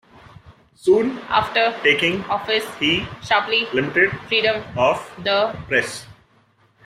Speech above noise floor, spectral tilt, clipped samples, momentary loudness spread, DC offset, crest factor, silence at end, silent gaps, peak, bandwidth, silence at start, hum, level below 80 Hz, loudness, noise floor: 38 dB; -4 dB/octave; under 0.1%; 5 LU; under 0.1%; 18 dB; 0.75 s; none; -2 dBFS; 14.5 kHz; 0.45 s; none; -54 dBFS; -19 LUFS; -58 dBFS